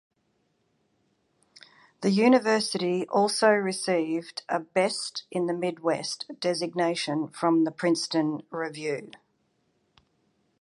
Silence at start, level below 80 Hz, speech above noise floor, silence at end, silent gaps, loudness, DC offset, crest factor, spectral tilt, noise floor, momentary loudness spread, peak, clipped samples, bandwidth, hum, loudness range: 2 s; -78 dBFS; 46 dB; 1.55 s; none; -26 LUFS; under 0.1%; 20 dB; -4.5 dB/octave; -72 dBFS; 10 LU; -8 dBFS; under 0.1%; 11.5 kHz; none; 4 LU